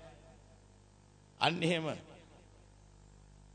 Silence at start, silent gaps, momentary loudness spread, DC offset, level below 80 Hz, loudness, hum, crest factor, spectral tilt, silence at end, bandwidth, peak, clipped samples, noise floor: 0 s; none; 26 LU; under 0.1%; -64 dBFS; -34 LUFS; 50 Hz at -65 dBFS; 28 dB; -5 dB/octave; 1.2 s; 9 kHz; -12 dBFS; under 0.1%; -62 dBFS